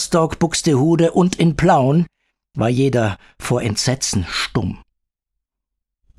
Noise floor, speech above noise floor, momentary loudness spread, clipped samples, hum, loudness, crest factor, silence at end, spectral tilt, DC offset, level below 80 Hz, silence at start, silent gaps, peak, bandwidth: -80 dBFS; 64 dB; 10 LU; under 0.1%; none; -17 LUFS; 16 dB; 1.4 s; -5.5 dB/octave; under 0.1%; -42 dBFS; 0 s; none; -2 dBFS; 13.5 kHz